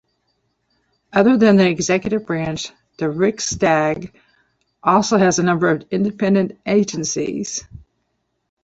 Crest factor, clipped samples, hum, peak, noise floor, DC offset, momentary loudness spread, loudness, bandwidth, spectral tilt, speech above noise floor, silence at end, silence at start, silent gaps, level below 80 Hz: 16 dB; under 0.1%; none; -2 dBFS; -71 dBFS; under 0.1%; 12 LU; -18 LUFS; 8 kHz; -5 dB/octave; 54 dB; 0.85 s; 1.15 s; none; -52 dBFS